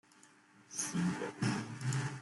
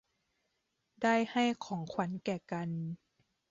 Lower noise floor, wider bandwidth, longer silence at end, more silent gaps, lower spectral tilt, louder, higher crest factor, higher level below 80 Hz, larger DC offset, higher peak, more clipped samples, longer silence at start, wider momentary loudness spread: second, -64 dBFS vs -82 dBFS; first, 12 kHz vs 7.6 kHz; second, 0 s vs 0.55 s; neither; about the same, -4.5 dB/octave vs -4.5 dB/octave; about the same, -37 LUFS vs -35 LUFS; about the same, 16 dB vs 18 dB; about the same, -72 dBFS vs -76 dBFS; neither; second, -22 dBFS vs -18 dBFS; neither; second, 0.25 s vs 1 s; second, 4 LU vs 10 LU